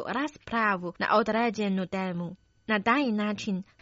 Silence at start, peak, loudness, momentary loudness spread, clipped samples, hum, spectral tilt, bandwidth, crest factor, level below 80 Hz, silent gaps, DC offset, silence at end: 0 s; -10 dBFS; -28 LUFS; 9 LU; under 0.1%; none; -4 dB/octave; 7.6 kHz; 18 dB; -64 dBFS; none; under 0.1%; 0.2 s